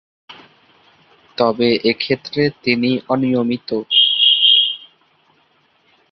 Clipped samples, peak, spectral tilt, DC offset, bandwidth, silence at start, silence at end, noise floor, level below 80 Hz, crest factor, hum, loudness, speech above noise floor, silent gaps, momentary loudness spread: under 0.1%; -2 dBFS; -6.5 dB/octave; under 0.1%; 6 kHz; 0.3 s; 1.35 s; -58 dBFS; -60 dBFS; 16 dB; none; -14 LUFS; 41 dB; none; 10 LU